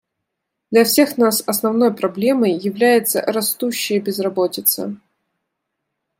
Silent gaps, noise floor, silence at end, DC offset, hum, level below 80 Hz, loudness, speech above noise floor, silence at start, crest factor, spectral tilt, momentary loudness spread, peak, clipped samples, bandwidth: none; -78 dBFS; 1.25 s; under 0.1%; none; -70 dBFS; -17 LUFS; 61 dB; 0.7 s; 16 dB; -3.5 dB/octave; 6 LU; -2 dBFS; under 0.1%; 16.5 kHz